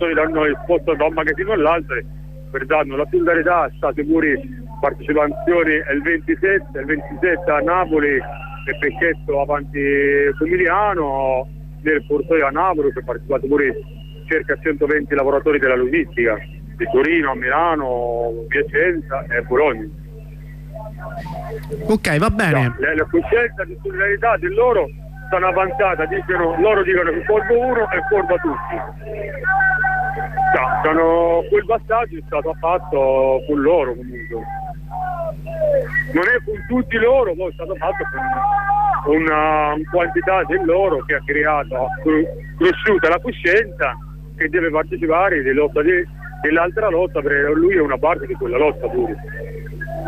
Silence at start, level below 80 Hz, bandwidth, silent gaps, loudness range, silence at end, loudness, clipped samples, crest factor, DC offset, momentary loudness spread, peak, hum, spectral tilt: 0 s; -36 dBFS; 14.5 kHz; none; 3 LU; 0 s; -18 LUFS; under 0.1%; 12 dB; 0.3%; 12 LU; -6 dBFS; none; -7 dB/octave